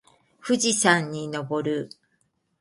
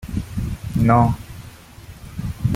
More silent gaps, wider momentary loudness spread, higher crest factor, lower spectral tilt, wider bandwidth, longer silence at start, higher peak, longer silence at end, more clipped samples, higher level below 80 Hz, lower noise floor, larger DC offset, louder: neither; second, 14 LU vs 25 LU; about the same, 22 dB vs 20 dB; second, -3 dB/octave vs -8 dB/octave; second, 11.5 kHz vs 16 kHz; first, 0.45 s vs 0 s; about the same, -4 dBFS vs -2 dBFS; first, 0.75 s vs 0 s; neither; second, -68 dBFS vs -36 dBFS; first, -71 dBFS vs -41 dBFS; neither; second, -24 LUFS vs -21 LUFS